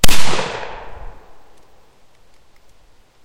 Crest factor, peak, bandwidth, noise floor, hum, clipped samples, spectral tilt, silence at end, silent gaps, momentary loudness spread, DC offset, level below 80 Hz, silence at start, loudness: 14 dB; 0 dBFS; 16.5 kHz; -52 dBFS; none; 0.9%; -2.5 dB/octave; 2.15 s; none; 24 LU; under 0.1%; -30 dBFS; 0.05 s; -22 LUFS